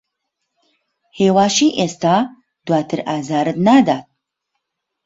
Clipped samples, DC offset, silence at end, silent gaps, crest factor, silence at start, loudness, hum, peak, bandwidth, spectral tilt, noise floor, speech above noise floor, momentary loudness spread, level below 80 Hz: under 0.1%; under 0.1%; 1.05 s; none; 16 dB; 1.15 s; -16 LUFS; none; -2 dBFS; 8 kHz; -5 dB/octave; -76 dBFS; 61 dB; 9 LU; -58 dBFS